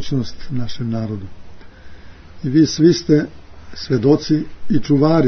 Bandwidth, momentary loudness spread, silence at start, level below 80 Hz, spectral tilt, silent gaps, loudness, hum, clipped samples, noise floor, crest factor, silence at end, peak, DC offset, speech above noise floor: 6.6 kHz; 17 LU; 0 s; -40 dBFS; -7 dB/octave; none; -18 LUFS; none; under 0.1%; -36 dBFS; 16 dB; 0 s; -2 dBFS; under 0.1%; 20 dB